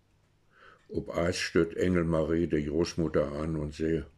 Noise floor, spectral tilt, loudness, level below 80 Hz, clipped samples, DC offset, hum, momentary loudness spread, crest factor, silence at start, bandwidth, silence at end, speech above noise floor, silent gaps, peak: -67 dBFS; -6 dB/octave; -30 LUFS; -48 dBFS; under 0.1%; under 0.1%; none; 6 LU; 20 dB; 0.9 s; 12.5 kHz; 0.1 s; 38 dB; none; -10 dBFS